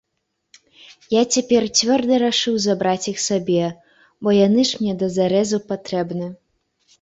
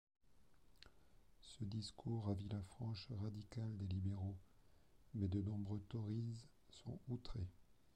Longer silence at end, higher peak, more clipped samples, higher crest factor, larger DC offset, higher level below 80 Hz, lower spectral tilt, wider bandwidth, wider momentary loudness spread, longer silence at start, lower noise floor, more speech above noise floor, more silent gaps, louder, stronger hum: first, 0.7 s vs 0.3 s; first, -4 dBFS vs -30 dBFS; neither; about the same, 16 dB vs 18 dB; neither; first, -60 dBFS vs -66 dBFS; second, -4 dB/octave vs -7.5 dB/octave; second, 8 kHz vs 9.8 kHz; second, 9 LU vs 17 LU; about the same, 1.1 s vs 1.15 s; about the same, -75 dBFS vs -73 dBFS; first, 56 dB vs 27 dB; neither; first, -19 LUFS vs -48 LUFS; neither